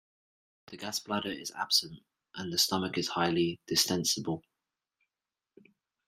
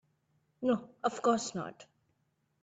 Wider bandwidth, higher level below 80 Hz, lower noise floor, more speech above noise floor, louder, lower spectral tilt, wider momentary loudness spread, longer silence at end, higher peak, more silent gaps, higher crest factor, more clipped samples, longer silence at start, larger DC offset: first, 16 kHz vs 9.2 kHz; first, -72 dBFS vs -78 dBFS; first, under -90 dBFS vs -77 dBFS; first, over 58 dB vs 45 dB; first, -30 LUFS vs -33 LUFS; second, -3 dB/octave vs -4.5 dB/octave; first, 14 LU vs 11 LU; first, 1.65 s vs 0.8 s; first, -12 dBFS vs -16 dBFS; neither; about the same, 22 dB vs 20 dB; neither; about the same, 0.7 s vs 0.6 s; neither